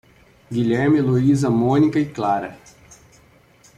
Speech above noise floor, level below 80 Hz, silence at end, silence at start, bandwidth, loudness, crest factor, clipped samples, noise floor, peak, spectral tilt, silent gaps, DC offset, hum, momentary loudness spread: 34 dB; -52 dBFS; 1.25 s; 0.5 s; 11 kHz; -19 LUFS; 14 dB; under 0.1%; -52 dBFS; -6 dBFS; -8 dB/octave; none; under 0.1%; none; 8 LU